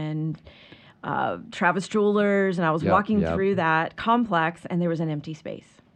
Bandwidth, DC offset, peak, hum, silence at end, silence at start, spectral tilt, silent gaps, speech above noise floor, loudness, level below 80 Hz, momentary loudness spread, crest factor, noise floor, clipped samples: 9.4 kHz; under 0.1%; -6 dBFS; none; 0.35 s; 0 s; -7 dB/octave; none; 27 dB; -24 LUFS; -54 dBFS; 14 LU; 18 dB; -50 dBFS; under 0.1%